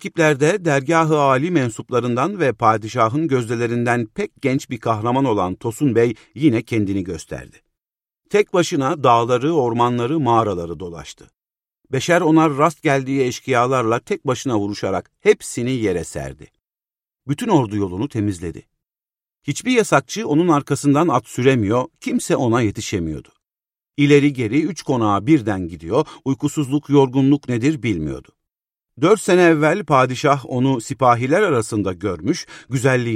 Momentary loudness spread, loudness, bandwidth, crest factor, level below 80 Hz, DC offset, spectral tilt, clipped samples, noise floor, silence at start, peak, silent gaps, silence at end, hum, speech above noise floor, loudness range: 10 LU; -18 LUFS; 15 kHz; 18 dB; -50 dBFS; under 0.1%; -6 dB/octave; under 0.1%; under -90 dBFS; 0 s; 0 dBFS; none; 0 s; none; over 72 dB; 4 LU